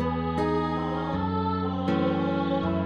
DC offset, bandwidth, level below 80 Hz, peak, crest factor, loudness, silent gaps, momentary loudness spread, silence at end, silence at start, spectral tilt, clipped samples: 0.2%; 8.6 kHz; -46 dBFS; -14 dBFS; 12 dB; -27 LUFS; none; 3 LU; 0 s; 0 s; -8.5 dB/octave; under 0.1%